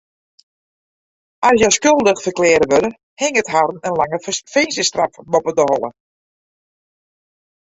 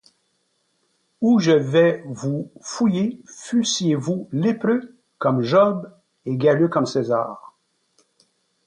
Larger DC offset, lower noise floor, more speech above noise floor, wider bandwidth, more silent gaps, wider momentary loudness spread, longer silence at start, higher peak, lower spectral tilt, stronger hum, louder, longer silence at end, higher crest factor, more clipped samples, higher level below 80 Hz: neither; first, under -90 dBFS vs -69 dBFS; first, over 74 dB vs 49 dB; second, 8 kHz vs 10.5 kHz; first, 3.03-3.17 s vs none; second, 9 LU vs 14 LU; first, 1.4 s vs 1.2 s; first, 0 dBFS vs -4 dBFS; second, -3 dB/octave vs -5.5 dB/octave; neither; first, -16 LUFS vs -21 LUFS; first, 1.85 s vs 1.2 s; about the same, 18 dB vs 16 dB; neither; first, -52 dBFS vs -66 dBFS